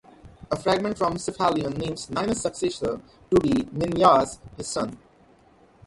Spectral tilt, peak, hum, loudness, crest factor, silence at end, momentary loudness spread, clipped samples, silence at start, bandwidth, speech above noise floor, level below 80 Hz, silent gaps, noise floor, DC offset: -5 dB/octave; -4 dBFS; none; -24 LUFS; 22 dB; 0.9 s; 12 LU; under 0.1%; 0.25 s; 11.5 kHz; 32 dB; -50 dBFS; none; -56 dBFS; under 0.1%